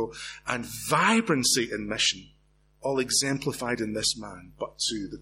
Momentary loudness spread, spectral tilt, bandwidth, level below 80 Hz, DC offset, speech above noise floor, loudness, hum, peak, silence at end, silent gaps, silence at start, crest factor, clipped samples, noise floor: 13 LU; -2.5 dB/octave; 16.5 kHz; -56 dBFS; under 0.1%; 32 dB; -26 LUFS; none; -10 dBFS; 0 s; none; 0 s; 20 dB; under 0.1%; -60 dBFS